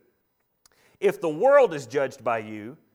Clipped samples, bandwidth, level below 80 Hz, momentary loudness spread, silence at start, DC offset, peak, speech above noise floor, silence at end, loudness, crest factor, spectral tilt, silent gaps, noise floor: under 0.1%; 15.5 kHz; -74 dBFS; 13 LU; 1 s; under 0.1%; -6 dBFS; 50 dB; 0.2 s; -23 LUFS; 18 dB; -5.5 dB/octave; none; -73 dBFS